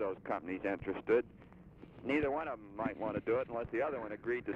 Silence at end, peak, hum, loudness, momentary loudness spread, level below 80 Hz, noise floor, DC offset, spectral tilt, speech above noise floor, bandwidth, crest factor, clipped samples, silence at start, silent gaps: 0 s; -18 dBFS; none; -37 LUFS; 13 LU; -62 dBFS; -56 dBFS; under 0.1%; -8 dB/octave; 19 dB; 7 kHz; 18 dB; under 0.1%; 0 s; none